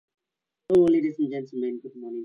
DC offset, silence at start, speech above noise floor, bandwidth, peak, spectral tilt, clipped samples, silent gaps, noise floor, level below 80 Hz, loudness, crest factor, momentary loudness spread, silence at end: under 0.1%; 0.7 s; 62 dB; 6.6 kHz; -10 dBFS; -8.5 dB/octave; under 0.1%; none; -86 dBFS; -66 dBFS; -24 LUFS; 16 dB; 15 LU; 0 s